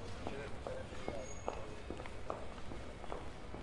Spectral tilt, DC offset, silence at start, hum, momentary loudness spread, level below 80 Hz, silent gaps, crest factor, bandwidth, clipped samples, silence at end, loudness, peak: -5 dB/octave; under 0.1%; 0 s; none; 4 LU; -54 dBFS; none; 22 dB; 11.5 kHz; under 0.1%; 0 s; -47 LUFS; -22 dBFS